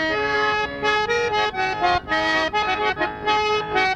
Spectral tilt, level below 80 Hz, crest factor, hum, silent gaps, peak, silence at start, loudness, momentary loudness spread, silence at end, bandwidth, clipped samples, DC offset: -3.5 dB/octave; -46 dBFS; 14 dB; none; none; -8 dBFS; 0 s; -21 LUFS; 2 LU; 0 s; 10 kHz; under 0.1%; under 0.1%